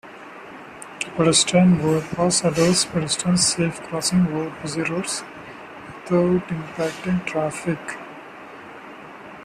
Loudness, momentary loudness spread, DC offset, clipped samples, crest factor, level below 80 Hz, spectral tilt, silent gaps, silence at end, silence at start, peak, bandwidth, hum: -21 LUFS; 22 LU; under 0.1%; under 0.1%; 20 dB; -54 dBFS; -4 dB/octave; none; 0 s; 0.05 s; -2 dBFS; 14 kHz; none